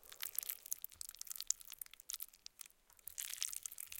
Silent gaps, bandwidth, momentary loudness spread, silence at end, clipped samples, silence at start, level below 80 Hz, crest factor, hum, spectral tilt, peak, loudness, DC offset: none; 17 kHz; 13 LU; 0 s; under 0.1%; 0 s; -78 dBFS; 36 dB; none; 3.5 dB/octave; -12 dBFS; -45 LUFS; under 0.1%